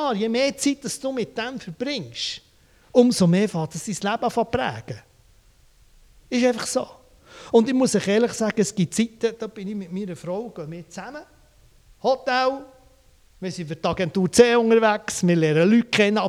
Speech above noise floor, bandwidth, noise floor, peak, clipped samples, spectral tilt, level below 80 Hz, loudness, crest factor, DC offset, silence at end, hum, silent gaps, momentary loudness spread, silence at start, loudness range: 34 dB; 14.5 kHz; -55 dBFS; 0 dBFS; under 0.1%; -5 dB/octave; -56 dBFS; -22 LUFS; 22 dB; under 0.1%; 0 s; none; none; 17 LU; 0 s; 7 LU